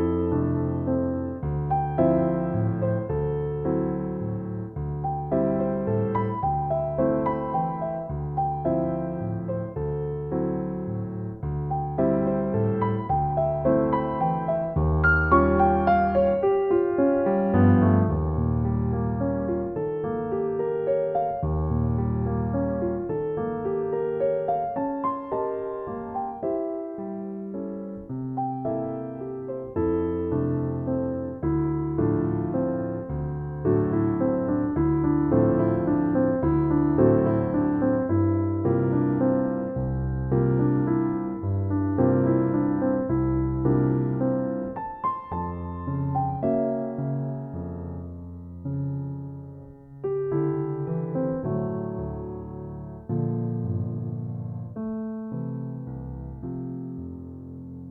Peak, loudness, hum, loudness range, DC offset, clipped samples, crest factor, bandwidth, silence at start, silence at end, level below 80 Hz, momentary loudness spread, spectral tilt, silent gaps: -6 dBFS; -26 LUFS; none; 9 LU; under 0.1%; under 0.1%; 18 dB; 4.5 kHz; 0 s; 0 s; -40 dBFS; 12 LU; -12.5 dB/octave; none